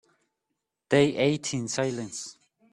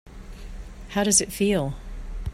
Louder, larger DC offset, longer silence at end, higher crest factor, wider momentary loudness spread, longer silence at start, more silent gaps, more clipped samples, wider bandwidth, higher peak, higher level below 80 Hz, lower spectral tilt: second, -26 LUFS vs -22 LUFS; neither; first, 0.4 s vs 0 s; about the same, 20 dB vs 20 dB; second, 14 LU vs 23 LU; first, 0.9 s vs 0.05 s; neither; neither; second, 11.5 kHz vs 16 kHz; about the same, -8 dBFS vs -6 dBFS; second, -66 dBFS vs -38 dBFS; about the same, -4.5 dB/octave vs -3.5 dB/octave